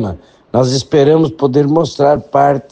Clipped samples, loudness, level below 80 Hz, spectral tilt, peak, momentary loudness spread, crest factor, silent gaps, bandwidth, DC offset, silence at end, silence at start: under 0.1%; -12 LUFS; -44 dBFS; -6.5 dB/octave; 0 dBFS; 7 LU; 12 dB; none; 9.2 kHz; under 0.1%; 0.1 s; 0 s